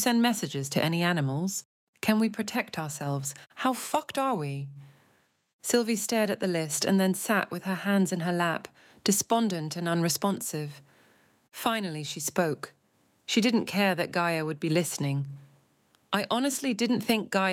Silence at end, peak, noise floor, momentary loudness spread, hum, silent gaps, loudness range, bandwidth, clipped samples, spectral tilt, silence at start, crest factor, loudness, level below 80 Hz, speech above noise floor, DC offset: 0 s; -10 dBFS; -68 dBFS; 10 LU; none; 1.65-1.93 s, 5.53-5.59 s; 4 LU; 17 kHz; under 0.1%; -4.5 dB/octave; 0 s; 18 dB; -28 LUFS; -76 dBFS; 40 dB; under 0.1%